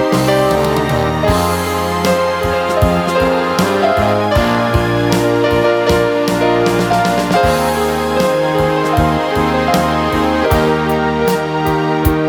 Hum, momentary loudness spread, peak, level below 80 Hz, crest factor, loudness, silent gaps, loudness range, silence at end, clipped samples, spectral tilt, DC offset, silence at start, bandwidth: none; 3 LU; 0 dBFS; -28 dBFS; 14 dB; -14 LUFS; none; 1 LU; 0 s; under 0.1%; -5.5 dB/octave; under 0.1%; 0 s; 19.5 kHz